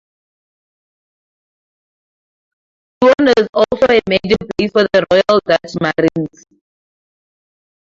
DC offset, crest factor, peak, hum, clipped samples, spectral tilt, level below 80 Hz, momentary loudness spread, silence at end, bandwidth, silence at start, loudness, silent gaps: under 0.1%; 16 dB; 0 dBFS; none; under 0.1%; -6 dB/octave; -48 dBFS; 6 LU; 1.55 s; 7.6 kHz; 3 s; -13 LUFS; 3.49-3.53 s